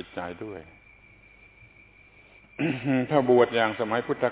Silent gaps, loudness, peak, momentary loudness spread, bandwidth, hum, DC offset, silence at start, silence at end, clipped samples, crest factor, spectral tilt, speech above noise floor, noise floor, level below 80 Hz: none; -25 LUFS; -8 dBFS; 19 LU; 4 kHz; 50 Hz at -65 dBFS; under 0.1%; 0 s; 0 s; under 0.1%; 20 dB; -10 dB/octave; 30 dB; -55 dBFS; -62 dBFS